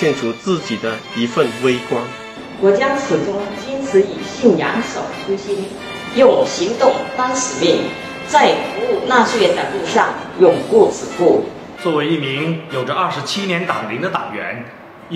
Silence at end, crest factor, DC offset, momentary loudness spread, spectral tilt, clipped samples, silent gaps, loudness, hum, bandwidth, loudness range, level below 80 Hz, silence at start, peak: 0 s; 16 dB; under 0.1%; 11 LU; -4.5 dB/octave; under 0.1%; none; -17 LUFS; none; 13 kHz; 4 LU; -56 dBFS; 0 s; 0 dBFS